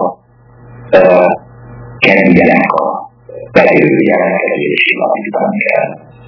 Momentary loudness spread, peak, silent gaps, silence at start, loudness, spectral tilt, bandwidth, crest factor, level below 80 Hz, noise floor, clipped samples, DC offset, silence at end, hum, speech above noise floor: 12 LU; 0 dBFS; none; 0 s; -10 LUFS; -8 dB/octave; 5.4 kHz; 12 dB; -46 dBFS; -41 dBFS; 1%; under 0.1%; 0.3 s; none; 30 dB